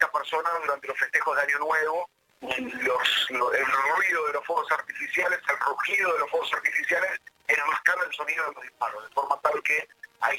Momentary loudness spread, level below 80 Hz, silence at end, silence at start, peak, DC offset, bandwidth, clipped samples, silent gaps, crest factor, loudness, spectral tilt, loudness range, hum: 8 LU; -72 dBFS; 0 s; 0 s; -6 dBFS; under 0.1%; 17 kHz; under 0.1%; none; 22 dB; -26 LUFS; -1 dB/octave; 2 LU; none